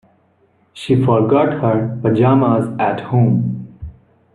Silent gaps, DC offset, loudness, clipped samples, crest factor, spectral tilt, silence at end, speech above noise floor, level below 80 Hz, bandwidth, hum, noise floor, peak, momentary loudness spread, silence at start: none; under 0.1%; -15 LUFS; under 0.1%; 16 dB; -9 dB/octave; 0.45 s; 43 dB; -46 dBFS; 10.5 kHz; none; -57 dBFS; 0 dBFS; 18 LU; 0.75 s